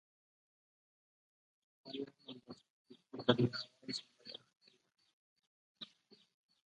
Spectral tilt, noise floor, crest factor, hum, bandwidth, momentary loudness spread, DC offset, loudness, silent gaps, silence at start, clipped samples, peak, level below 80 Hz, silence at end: -6 dB/octave; -68 dBFS; 32 dB; none; 9.8 kHz; 21 LU; under 0.1%; -39 LUFS; 2.70-2.85 s, 5.13-5.36 s, 5.47-5.75 s; 1.85 s; under 0.1%; -14 dBFS; -78 dBFS; 0.85 s